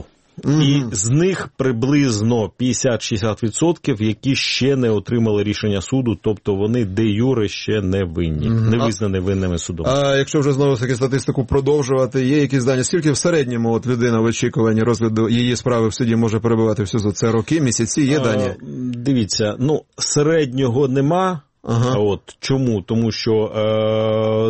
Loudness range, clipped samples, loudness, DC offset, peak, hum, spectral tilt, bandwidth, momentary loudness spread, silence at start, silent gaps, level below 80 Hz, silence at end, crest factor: 2 LU; under 0.1%; -18 LUFS; 0.2%; -6 dBFS; none; -5.5 dB/octave; 8.8 kHz; 4 LU; 0 s; none; -42 dBFS; 0 s; 12 dB